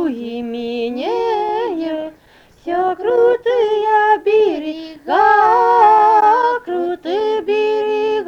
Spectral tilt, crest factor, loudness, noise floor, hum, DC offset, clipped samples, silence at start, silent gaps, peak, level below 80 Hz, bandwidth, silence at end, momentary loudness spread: -5 dB/octave; 14 dB; -15 LUFS; -48 dBFS; none; under 0.1%; under 0.1%; 0 s; none; -2 dBFS; -56 dBFS; 7 kHz; 0 s; 13 LU